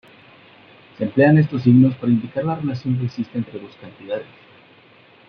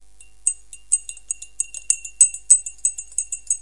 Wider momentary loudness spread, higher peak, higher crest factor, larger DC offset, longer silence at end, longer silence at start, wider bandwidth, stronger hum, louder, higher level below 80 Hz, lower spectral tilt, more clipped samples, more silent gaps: about the same, 17 LU vs 15 LU; about the same, 0 dBFS vs 0 dBFS; about the same, 20 dB vs 22 dB; second, under 0.1% vs 0.7%; first, 1.05 s vs 0 s; first, 1 s vs 0.45 s; second, 5.6 kHz vs 11.5 kHz; neither; about the same, -19 LUFS vs -19 LUFS; about the same, -60 dBFS vs -56 dBFS; first, -10.5 dB/octave vs 4 dB/octave; neither; neither